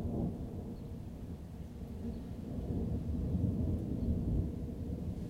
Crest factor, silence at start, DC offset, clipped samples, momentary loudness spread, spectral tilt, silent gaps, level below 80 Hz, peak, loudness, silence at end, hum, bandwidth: 14 dB; 0 s; under 0.1%; under 0.1%; 11 LU; -10 dB/octave; none; -44 dBFS; -22 dBFS; -39 LUFS; 0 s; none; 15.5 kHz